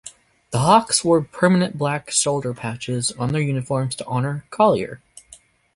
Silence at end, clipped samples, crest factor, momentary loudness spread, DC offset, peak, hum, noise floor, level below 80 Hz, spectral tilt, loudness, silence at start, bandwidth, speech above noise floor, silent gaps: 0.4 s; under 0.1%; 20 dB; 12 LU; under 0.1%; -2 dBFS; none; -50 dBFS; -54 dBFS; -4.5 dB/octave; -20 LUFS; 0.05 s; 11.5 kHz; 30 dB; none